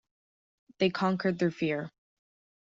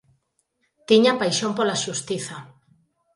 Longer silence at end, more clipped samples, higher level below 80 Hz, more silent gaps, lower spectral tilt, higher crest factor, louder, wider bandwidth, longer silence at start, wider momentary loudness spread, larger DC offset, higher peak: about the same, 0.75 s vs 0.7 s; neither; about the same, -72 dBFS vs -68 dBFS; neither; first, -5 dB/octave vs -3.5 dB/octave; about the same, 20 dB vs 22 dB; second, -30 LUFS vs -21 LUFS; second, 7.6 kHz vs 11.5 kHz; about the same, 0.8 s vs 0.9 s; second, 7 LU vs 14 LU; neither; second, -12 dBFS vs -2 dBFS